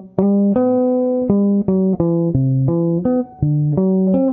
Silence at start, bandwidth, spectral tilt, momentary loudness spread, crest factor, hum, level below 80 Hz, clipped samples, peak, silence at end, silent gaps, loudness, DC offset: 0 s; 2.4 kHz; -14 dB/octave; 3 LU; 14 dB; none; -44 dBFS; under 0.1%; -2 dBFS; 0 s; none; -16 LUFS; under 0.1%